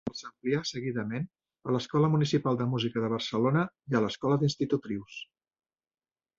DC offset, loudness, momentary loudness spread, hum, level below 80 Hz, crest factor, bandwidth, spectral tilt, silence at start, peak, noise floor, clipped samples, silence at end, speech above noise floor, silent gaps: under 0.1%; -30 LUFS; 12 LU; none; -66 dBFS; 18 dB; 7.6 kHz; -6.5 dB/octave; 0.05 s; -12 dBFS; under -90 dBFS; under 0.1%; 1.15 s; over 61 dB; none